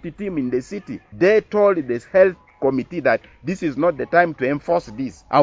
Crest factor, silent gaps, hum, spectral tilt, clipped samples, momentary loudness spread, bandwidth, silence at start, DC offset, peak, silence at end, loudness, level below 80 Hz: 18 dB; none; none; -7 dB/octave; under 0.1%; 13 LU; 7.8 kHz; 0.05 s; under 0.1%; -2 dBFS; 0 s; -20 LUFS; -52 dBFS